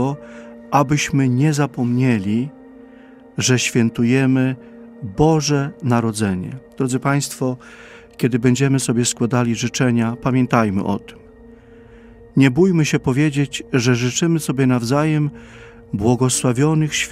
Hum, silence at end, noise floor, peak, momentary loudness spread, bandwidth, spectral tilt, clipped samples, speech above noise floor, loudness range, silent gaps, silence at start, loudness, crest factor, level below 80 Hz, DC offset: none; 0 s; -43 dBFS; 0 dBFS; 9 LU; 15.5 kHz; -5.5 dB/octave; under 0.1%; 26 dB; 2 LU; none; 0 s; -18 LUFS; 18 dB; -48 dBFS; under 0.1%